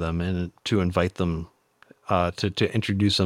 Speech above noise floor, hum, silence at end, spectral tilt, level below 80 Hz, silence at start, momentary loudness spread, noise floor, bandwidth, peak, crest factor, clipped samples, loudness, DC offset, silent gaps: 33 dB; none; 0 s; -6 dB/octave; -44 dBFS; 0 s; 8 LU; -57 dBFS; 13.5 kHz; -6 dBFS; 18 dB; under 0.1%; -25 LUFS; under 0.1%; none